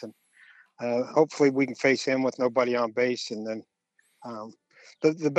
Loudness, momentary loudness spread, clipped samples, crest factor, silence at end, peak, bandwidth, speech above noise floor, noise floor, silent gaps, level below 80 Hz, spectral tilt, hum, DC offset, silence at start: -26 LUFS; 17 LU; under 0.1%; 20 dB; 0 s; -8 dBFS; 8.8 kHz; 44 dB; -69 dBFS; none; -80 dBFS; -5 dB/octave; none; under 0.1%; 0 s